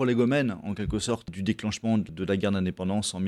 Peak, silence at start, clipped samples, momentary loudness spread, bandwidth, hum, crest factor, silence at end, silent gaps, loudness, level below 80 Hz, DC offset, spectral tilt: -12 dBFS; 0 s; under 0.1%; 7 LU; 12.5 kHz; none; 14 dB; 0 s; none; -28 LUFS; -48 dBFS; under 0.1%; -5.5 dB/octave